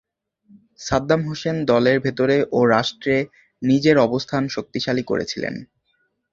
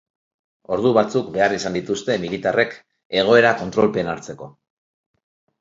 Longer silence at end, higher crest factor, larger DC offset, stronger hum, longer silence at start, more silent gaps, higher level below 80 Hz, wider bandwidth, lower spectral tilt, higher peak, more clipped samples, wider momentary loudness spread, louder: second, 0.7 s vs 1.1 s; about the same, 20 dB vs 20 dB; neither; neither; about the same, 0.8 s vs 0.7 s; second, none vs 3.05-3.10 s; about the same, -52 dBFS vs -56 dBFS; about the same, 7.6 kHz vs 7.8 kHz; about the same, -6 dB/octave vs -5 dB/octave; about the same, -2 dBFS vs 0 dBFS; neither; about the same, 10 LU vs 12 LU; about the same, -20 LUFS vs -19 LUFS